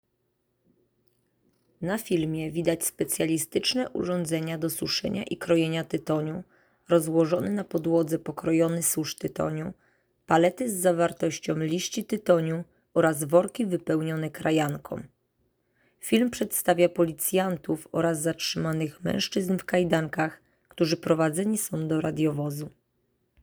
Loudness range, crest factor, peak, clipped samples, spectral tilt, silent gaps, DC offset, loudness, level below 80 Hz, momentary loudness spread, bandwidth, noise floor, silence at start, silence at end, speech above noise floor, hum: 2 LU; 20 dB; -6 dBFS; under 0.1%; -5 dB/octave; none; under 0.1%; -27 LUFS; -62 dBFS; 8 LU; over 20 kHz; -75 dBFS; 1.8 s; 0.75 s; 49 dB; none